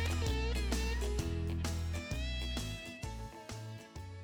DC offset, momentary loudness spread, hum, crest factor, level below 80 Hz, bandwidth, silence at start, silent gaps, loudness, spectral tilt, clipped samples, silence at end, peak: under 0.1%; 11 LU; none; 16 dB; -40 dBFS; 19.5 kHz; 0 s; none; -39 LUFS; -5 dB/octave; under 0.1%; 0 s; -22 dBFS